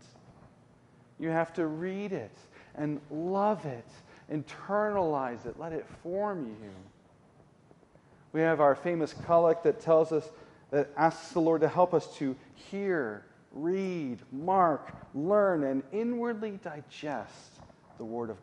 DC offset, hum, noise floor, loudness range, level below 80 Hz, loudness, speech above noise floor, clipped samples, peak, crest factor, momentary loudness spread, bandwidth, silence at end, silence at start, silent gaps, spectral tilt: under 0.1%; none; -60 dBFS; 7 LU; -68 dBFS; -30 LUFS; 30 dB; under 0.1%; -10 dBFS; 20 dB; 16 LU; 10.5 kHz; 0 s; 0.3 s; none; -7.5 dB/octave